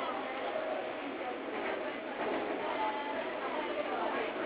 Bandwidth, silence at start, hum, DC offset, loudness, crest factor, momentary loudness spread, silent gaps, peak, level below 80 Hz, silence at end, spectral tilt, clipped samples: 4 kHz; 0 s; none; under 0.1%; -36 LUFS; 14 dB; 4 LU; none; -22 dBFS; -72 dBFS; 0 s; -1 dB/octave; under 0.1%